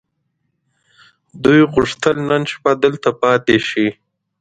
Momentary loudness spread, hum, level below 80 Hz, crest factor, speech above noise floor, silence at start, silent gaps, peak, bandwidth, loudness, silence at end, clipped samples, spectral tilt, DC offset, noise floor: 6 LU; none; -48 dBFS; 16 dB; 55 dB; 1.35 s; none; 0 dBFS; 9.2 kHz; -15 LUFS; 0.5 s; under 0.1%; -6 dB/octave; under 0.1%; -70 dBFS